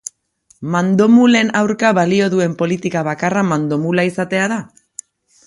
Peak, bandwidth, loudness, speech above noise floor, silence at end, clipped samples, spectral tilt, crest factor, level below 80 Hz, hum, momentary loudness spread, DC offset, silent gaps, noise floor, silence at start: 0 dBFS; 11.5 kHz; -15 LUFS; 41 dB; 0.8 s; under 0.1%; -6 dB/octave; 16 dB; -58 dBFS; none; 20 LU; under 0.1%; none; -56 dBFS; 0.6 s